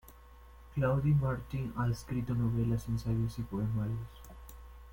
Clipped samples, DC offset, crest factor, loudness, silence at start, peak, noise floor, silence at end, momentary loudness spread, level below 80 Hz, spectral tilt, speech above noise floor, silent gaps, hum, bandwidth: under 0.1%; under 0.1%; 14 dB; -34 LUFS; 0.05 s; -20 dBFS; -54 dBFS; 0 s; 21 LU; -48 dBFS; -8.5 dB/octave; 22 dB; none; none; 17 kHz